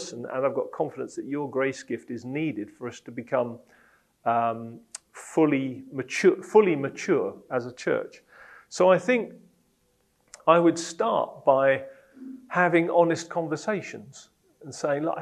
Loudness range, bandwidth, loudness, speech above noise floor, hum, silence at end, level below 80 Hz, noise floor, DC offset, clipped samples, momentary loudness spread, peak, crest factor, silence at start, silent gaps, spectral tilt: 7 LU; 12 kHz; -25 LUFS; 43 dB; none; 0 s; -76 dBFS; -68 dBFS; under 0.1%; under 0.1%; 19 LU; -4 dBFS; 22 dB; 0 s; none; -5.5 dB/octave